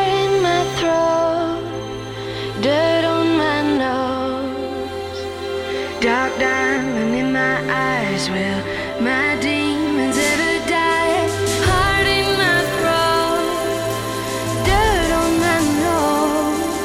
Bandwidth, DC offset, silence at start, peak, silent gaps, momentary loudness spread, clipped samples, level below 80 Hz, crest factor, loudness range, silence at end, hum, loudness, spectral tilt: 16.5 kHz; under 0.1%; 0 s; -4 dBFS; none; 9 LU; under 0.1%; -36 dBFS; 14 dB; 4 LU; 0 s; none; -18 LUFS; -4 dB/octave